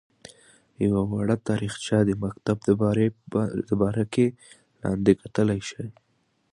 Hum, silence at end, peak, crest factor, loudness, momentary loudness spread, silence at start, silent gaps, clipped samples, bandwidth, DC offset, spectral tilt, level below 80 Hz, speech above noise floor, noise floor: none; 0.65 s; -4 dBFS; 20 dB; -25 LUFS; 8 LU; 0.8 s; none; under 0.1%; 11 kHz; under 0.1%; -7 dB/octave; -52 dBFS; 31 dB; -55 dBFS